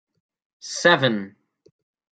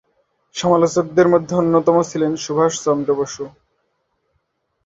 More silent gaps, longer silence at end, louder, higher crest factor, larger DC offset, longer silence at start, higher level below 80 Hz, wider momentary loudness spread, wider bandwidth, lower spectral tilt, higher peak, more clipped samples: neither; second, 0.9 s vs 1.35 s; second, -20 LUFS vs -17 LUFS; first, 24 dB vs 16 dB; neither; about the same, 0.65 s vs 0.55 s; second, -70 dBFS vs -58 dBFS; first, 23 LU vs 11 LU; first, 9.2 kHz vs 7.8 kHz; second, -4 dB/octave vs -5.5 dB/octave; about the same, -2 dBFS vs -2 dBFS; neither